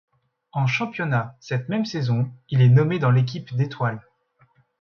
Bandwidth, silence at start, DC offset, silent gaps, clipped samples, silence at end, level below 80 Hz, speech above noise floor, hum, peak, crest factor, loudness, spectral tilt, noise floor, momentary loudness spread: 6.6 kHz; 0.55 s; under 0.1%; none; under 0.1%; 0.8 s; -60 dBFS; 41 dB; none; -6 dBFS; 16 dB; -22 LUFS; -7.5 dB/octave; -62 dBFS; 11 LU